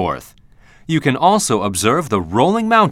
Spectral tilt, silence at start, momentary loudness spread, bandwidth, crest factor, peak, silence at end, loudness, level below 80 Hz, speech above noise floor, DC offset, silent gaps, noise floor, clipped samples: -4.5 dB/octave; 0 s; 8 LU; 16 kHz; 16 dB; 0 dBFS; 0 s; -16 LUFS; -48 dBFS; 30 dB; under 0.1%; none; -45 dBFS; under 0.1%